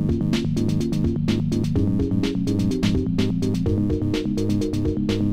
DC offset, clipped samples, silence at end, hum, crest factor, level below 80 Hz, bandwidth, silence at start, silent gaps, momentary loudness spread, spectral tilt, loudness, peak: 0.8%; under 0.1%; 0 s; none; 12 dB; -36 dBFS; 15 kHz; 0 s; none; 2 LU; -7.5 dB/octave; -22 LUFS; -8 dBFS